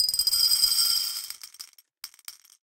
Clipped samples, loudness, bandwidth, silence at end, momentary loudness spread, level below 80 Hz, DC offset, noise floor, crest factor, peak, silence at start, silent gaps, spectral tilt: under 0.1%; -21 LUFS; 17 kHz; 0.35 s; 23 LU; -60 dBFS; under 0.1%; -48 dBFS; 18 dB; -8 dBFS; 0 s; none; 3.5 dB/octave